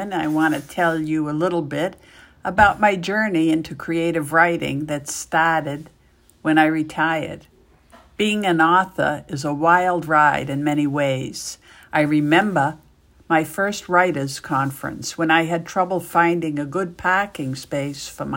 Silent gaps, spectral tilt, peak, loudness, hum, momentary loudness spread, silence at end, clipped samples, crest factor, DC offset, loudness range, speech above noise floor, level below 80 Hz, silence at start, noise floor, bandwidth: none; -5 dB/octave; -2 dBFS; -20 LUFS; none; 10 LU; 0 s; under 0.1%; 20 dB; under 0.1%; 3 LU; 31 dB; -52 dBFS; 0 s; -51 dBFS; 16.5 kHz